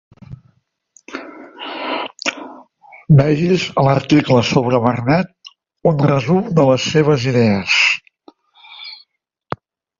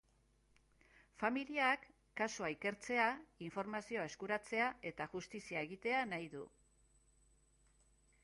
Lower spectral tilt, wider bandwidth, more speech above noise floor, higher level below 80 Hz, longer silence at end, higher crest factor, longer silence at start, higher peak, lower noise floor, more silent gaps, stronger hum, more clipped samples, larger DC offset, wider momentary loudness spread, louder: first, -6 dB/octave vs -4 dB/octave; second, 7.6 kHz vs 11.5 kHz; first, 49 dB vs 33 dB; first, -50 dBFS vs -74 dBFS; second, 1.05 s vs 1.75 s; second, 16 dB vs 22 dB; second, 0.3 s vs 1.2 s; first, 0 dBFS vs -20 dBFS; second, -62 dBFS vs -74 dBFS; neither; neither; neither; neither; first, 20 LU vs 12 LU; first, -15 LUFS vs -41 LUFS